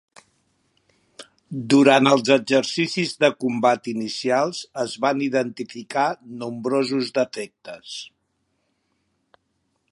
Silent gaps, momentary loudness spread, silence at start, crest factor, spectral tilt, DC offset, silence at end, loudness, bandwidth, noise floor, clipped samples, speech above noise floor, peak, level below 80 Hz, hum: none; 18 LU; 1.2 s; 22 dB; -4.5 dB/octave; under 0.1%; 1.85 s; -21 LUFS; 11.5 kHz; -72 dBFS; under 0.1%; 51 dB; -2 dBFS; -72 dBFS; none